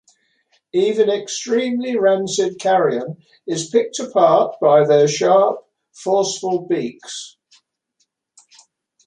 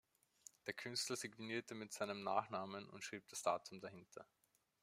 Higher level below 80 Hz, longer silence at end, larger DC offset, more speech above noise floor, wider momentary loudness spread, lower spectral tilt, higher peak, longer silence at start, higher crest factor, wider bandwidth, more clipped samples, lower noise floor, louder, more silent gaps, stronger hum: first, -68 dBFS vs -90 dBFS; first, 1.8 s vs 0.6 s; neither; first, 52 dB vs 21 dB; about the same, 15 LU vs 17 LU; first, -4.5 dB/octave vs -3 dB/octave; first, -2 dBFS vs -24 dBFS; about the same, 0.75 s vs 0.65 s; second, 16 dB vs 24 dB; second, 10.5 kHz vs 16 kHz; neither; about the same, -69 dBFS vs -67 dBFS; first, -17 LUFS vs -46 LUFS; neither; neither